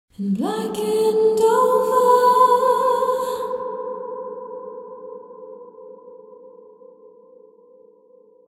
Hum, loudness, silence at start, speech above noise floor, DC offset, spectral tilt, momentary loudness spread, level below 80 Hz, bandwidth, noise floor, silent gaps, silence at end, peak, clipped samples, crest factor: none; -18 LUFS; 0.2 s; 34 dB; under 0.1%; -5 dB/octave; 24 LU; -68 dBFS; 16 kHz; -52 dBFS; none; 2 s; -4 dBFS; under 0.1%; 18 dB